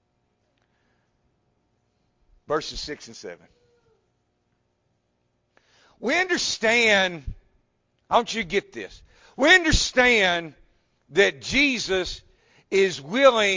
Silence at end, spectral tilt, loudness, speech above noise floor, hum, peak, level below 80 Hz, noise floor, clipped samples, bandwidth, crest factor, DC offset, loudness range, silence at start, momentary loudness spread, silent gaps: 0 s; -3 dB/octave; -21 LUFS; 50 dB; 60 Hz at -60 dBFS; -4 dBFS; -44 dBFS; -72 dBFS; under 0.1%; 7.6 kHz; 22 dB; under 0.1%; 15 LU; 2.5 s; 21 LU; none